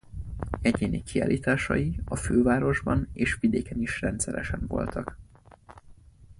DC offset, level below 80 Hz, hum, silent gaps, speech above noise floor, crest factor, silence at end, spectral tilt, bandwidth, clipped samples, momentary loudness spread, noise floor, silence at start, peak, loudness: under 0.1%; -40 dBFS; none; none; 26 dB; 18 dB; 0.05 s; -6 dB/octave; 11.5 kHz; under 0.1%; 9 LU; -52 dBFS; 0.1 s; -10 dBFS; -27 LUFS